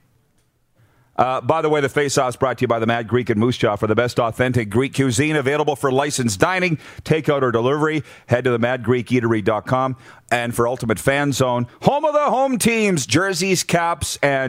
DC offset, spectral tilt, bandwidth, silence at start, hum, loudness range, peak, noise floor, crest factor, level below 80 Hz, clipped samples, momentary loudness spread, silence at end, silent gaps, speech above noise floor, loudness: under 0.1%; -5 dB/octave; 16 kHz; 1.2 s; none; 2 LU; 0 dBFS; -62 dBFS; 18 dB; -50 dBFS; under 0.1%; 4 LU; 0 s; none; 43 dB; -19 LUFS